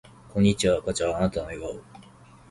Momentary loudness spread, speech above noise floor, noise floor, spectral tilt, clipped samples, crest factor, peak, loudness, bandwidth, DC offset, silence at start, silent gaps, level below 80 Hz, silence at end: 15 LU; 26 dB; -51 dBFS; -5.5 dB/octave; under 0.1%; 18 dB; -8 dBFS; -25 LUFS; 11.5 kHz; under 0.1%; 0.35 s; none; -46 dBFS; 0.5 s